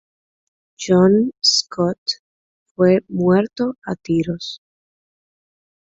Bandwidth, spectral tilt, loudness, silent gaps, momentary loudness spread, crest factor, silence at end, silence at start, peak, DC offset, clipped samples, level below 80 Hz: 8 kHz; -5 dB/octave; -18 LUFS; 1.98-2.06 s, 2.19-2.75 s, 3.78-3.82 s; 14 LU; 18 dB; 1.4 s; 0.8 s; -2 dBFS; under 0.1%; under 0.1%; -56 dBFS